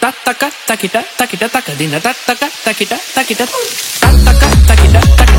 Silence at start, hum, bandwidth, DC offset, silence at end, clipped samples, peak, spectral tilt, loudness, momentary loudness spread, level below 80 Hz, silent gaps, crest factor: 0 s; none; 17 kHz; under 0.1%; 0 s; 2%; 0 dBFS; -4.5 dB/octave; -11 LUFS; 9 LU; -12 dBFS; none; 10 dB